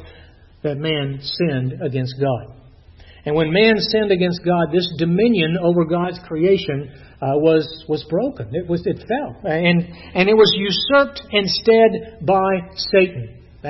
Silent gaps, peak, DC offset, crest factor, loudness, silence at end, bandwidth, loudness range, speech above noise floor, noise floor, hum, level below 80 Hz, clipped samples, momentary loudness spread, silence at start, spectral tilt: none; -2 dBFS; under 0.1%; 16 dB; -18 LUFS; 0 s; 6 kHz; 5 LU; 28 dB; -46 dBFS; none; -48 dBFS; under 0.1%; 10 LU; 0 s; -7 dB/octave